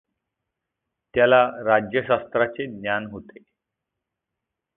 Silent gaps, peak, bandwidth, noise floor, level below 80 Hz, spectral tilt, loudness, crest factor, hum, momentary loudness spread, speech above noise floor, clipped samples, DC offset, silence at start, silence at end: none; -4 dBFS; 3.9 kHz; -84 dBFS; -60 dBFS; -9.5 dB/octave; -21 LUFS; 22 dB; none; 12 LU; 62 dB; under 0.1%; under 0.1%; 1.15 s; 1.55 s